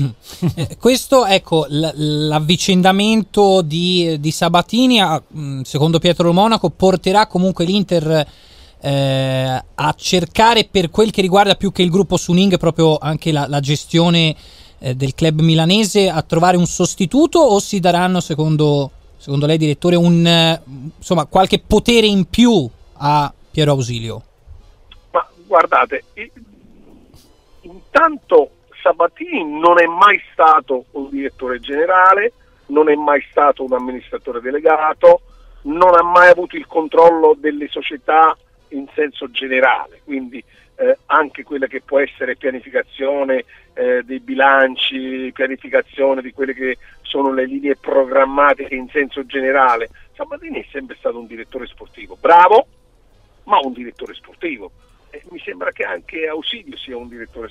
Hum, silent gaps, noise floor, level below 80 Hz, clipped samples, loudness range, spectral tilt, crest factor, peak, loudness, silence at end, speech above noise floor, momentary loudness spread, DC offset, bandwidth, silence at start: none; none; -51 dBFS; -42 dBFS; under 0.1%; 6 LU; -5 dB/octave; 16 dB; 0 dBFS; -15 LUFS; 0 s; 36 dB; 15 LU; under 0.1%; 15.5 kHz; 0 s